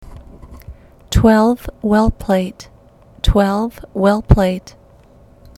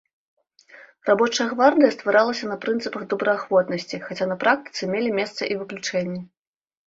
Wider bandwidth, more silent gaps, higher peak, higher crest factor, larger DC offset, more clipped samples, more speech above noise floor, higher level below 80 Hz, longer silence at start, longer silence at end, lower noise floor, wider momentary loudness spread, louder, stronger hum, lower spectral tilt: first, 15.5 kHz vs 7.8 kHz; neither; first, 0 dBFS vs -4 dBFS; about the same, 16 dB vs 20 dB; neither; neither; about the same, 31 dB vs 28 dB; first, -24 dBFS vs -68 dBFS; second, 0 s vs 0.75 s; first, 1 s vs 0.6 s; second, -46 dBFS vs -50 dBFS; about the same, 10 LU vs 10 LU; first, -16 LUFS vs -22 LUFS; neither; first, -7 dB/octave vs -4.5 dB/octave